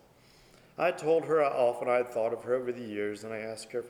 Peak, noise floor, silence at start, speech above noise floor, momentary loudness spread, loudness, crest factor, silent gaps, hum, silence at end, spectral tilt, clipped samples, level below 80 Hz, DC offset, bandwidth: -14 dBFS; -59 dBFS; 0.8 s; 30 dB; 12 LU; -30 LUFS; 16 dB; none; none; 0 s; -5.5 dB/octave; under 0.1%; -72 dBFS; under 0.1%; 15 kHz